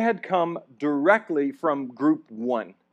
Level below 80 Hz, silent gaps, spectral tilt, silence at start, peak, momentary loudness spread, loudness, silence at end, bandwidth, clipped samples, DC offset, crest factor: -86 dBFS; none; -7.5 dB/octave; 0 s; -6 dBFS; 8 LU; -25 LUFS; 0.2 s; 7.8 kHz; under 0.1%; under 0.1%; 18 dB